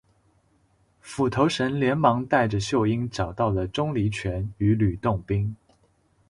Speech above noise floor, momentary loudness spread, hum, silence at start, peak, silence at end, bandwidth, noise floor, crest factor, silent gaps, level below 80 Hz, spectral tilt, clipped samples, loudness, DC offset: 41 dB; 8 LU; none; 1.05 s; -4 dBFS; 0.75 s; 11.5 kHz; -64 dBFS; 20 dB; none; -44 dBFS; -6.5 dB/octave; under 0.1%; -24 LUFS; under 0.1%